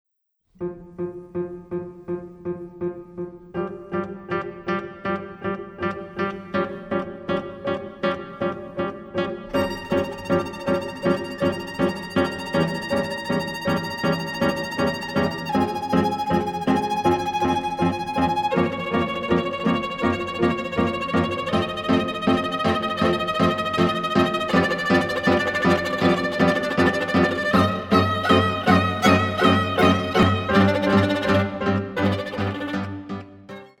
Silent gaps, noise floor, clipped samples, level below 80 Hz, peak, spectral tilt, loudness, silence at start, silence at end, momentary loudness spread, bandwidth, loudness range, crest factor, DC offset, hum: none; -70 dBFS; under 0.1%; -48 dBFS; -2 dBFS; -6 dB/octave; -23 LUFS; 0.6 s; 0.15 s; 12 LU; 17 kHz; 10 LU; 20 dB; under 0.1%; none